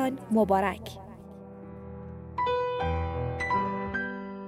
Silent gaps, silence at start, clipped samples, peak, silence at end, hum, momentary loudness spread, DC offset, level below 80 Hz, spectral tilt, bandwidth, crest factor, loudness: none; 0 s; under 0.1%; -12 dBFS; 0 s; none; 20 LU; under 0.1%; -50 dBFS; -7 dB/octave; 16 kHz; 18 dB; -29 LUFS